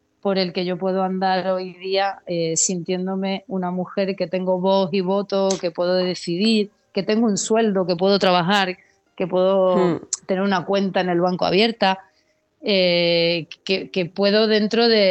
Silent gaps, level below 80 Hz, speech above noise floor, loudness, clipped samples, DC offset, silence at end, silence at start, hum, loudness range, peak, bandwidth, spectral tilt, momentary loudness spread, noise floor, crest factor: none; -68 dBFS; 45 dB; -20 LUFS; under 0.1%; under 0.1%; 0 s; 0.25 s; none; 3 LU; -4 dBFS; 8.6 kHz; -4 dB/octave; 8 LU; -64 dBFS; 16 dB